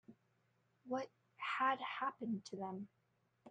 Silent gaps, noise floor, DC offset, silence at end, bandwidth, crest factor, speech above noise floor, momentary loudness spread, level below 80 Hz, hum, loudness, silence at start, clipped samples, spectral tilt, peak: none; -79 dBFS; under 0.1%; 0 s; 9 kHz; 20 dB; 38 dB; 13 LU; -90 dBFS; none; -42 LUFS; 0.1 s; under 0.1%; -5 dB/octave; -24 dBFS